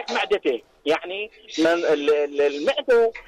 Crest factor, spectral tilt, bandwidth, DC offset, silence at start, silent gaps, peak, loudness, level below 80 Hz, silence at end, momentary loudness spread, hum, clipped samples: 10 dB; -3.5 dB/octave; 10.5 kHz; under 0.1%; 0 s; none; -12 dBFS; -22 LUFS; -60 dBFS; 0.05 s; 9 LU; none; under 0.1%